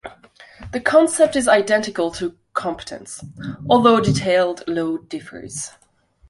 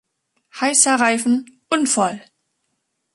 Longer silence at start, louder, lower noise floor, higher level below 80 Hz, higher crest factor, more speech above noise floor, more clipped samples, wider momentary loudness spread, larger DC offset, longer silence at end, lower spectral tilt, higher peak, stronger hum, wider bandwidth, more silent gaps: second, 0.05 s vs 0.55 s; about the same, -18 LUFS vs -17 LUFS; second, -47 dBFS vs -73 dBFS; first, -50 dBFS vs -70 dBFS; about the same, 18 dB vs 20 dB; second, 28 dB vs 55 dB; neither; first, 18 LU vs 9 LU; neither; second, 0.6 s vs 0.95 s; first, -4.5 dB/octave vs -2 dB/octave; about the same, -2 dBFS vs 0 dBFS; neither; about the same, 11.5 kHz vs 12 kHz; neither